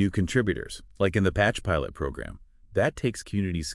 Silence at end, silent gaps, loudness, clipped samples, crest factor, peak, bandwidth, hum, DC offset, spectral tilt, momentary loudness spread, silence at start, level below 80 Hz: 0 s; none; -27 LUFS; under 0.1%; 18 dB; -8 dBFS; 12 kHz; none; under 0.1%; -6 dB/octave; 10 LU; 0 s; -44 dBFS